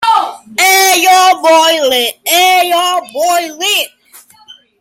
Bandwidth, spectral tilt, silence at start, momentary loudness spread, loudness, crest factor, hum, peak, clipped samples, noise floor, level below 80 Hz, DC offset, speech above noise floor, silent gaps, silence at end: 17 kHz; 1 dB/octave; 0 s; 7 LU; -9 LUFS; 10 dB; none; 0 dBFS; under 0.1%; -41 dBFS; -64 dBFS; under 0.1%; 31 dB; none; 0.95 s